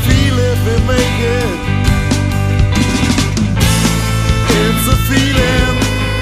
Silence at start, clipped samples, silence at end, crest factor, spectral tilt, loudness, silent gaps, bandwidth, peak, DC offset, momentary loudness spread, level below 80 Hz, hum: 0 s; under 0.1%; 0 s; 12 dB; -5 dB/octave; -13 LUFS; none; 15.5 kHz; 0 dBFS; under 0.1%; 3 LU; -20 dBFS; none